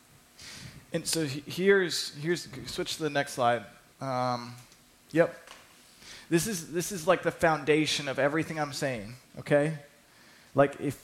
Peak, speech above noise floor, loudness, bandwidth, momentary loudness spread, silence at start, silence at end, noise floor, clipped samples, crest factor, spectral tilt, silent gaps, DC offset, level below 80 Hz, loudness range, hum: -10 dBFS; 28 dB; -29 LUFS; 16.5 kHz; 19 LU; 0.4 s; 0.05 s; -57 dBFS; under 0.1%; 20 dB; -4.5 dB/octave; none; under 0.1%; -62 dBFS; 4 LU; none